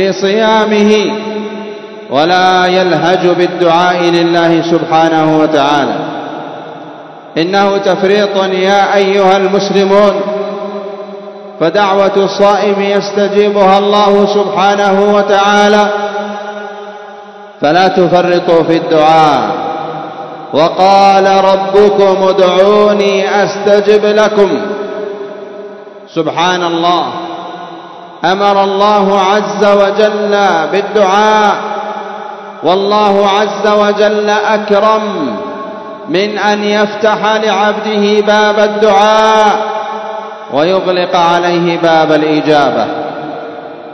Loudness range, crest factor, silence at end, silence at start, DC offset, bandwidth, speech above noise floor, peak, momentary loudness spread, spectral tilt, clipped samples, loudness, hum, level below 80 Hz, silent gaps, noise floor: 4 LU; 10 dB; 0 s; 0 s; under 0.1%; 8.6 kHz; 22 dB; 0 dBFS; 15 LU; -5 dB/octave; 0.8%; -9 LUFS; none; -52 dBFS; none; -30 dBFS